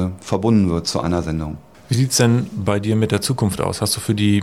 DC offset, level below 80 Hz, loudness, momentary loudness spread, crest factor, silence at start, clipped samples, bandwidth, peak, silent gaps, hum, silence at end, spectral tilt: 0.2%; -40 dBFS; -19 LUFS; 8 LU; 16 dB; 0 s; under 0.1%; 16 kHz; -2 dBFS; none; none; 0 s; -5.5 dB/octave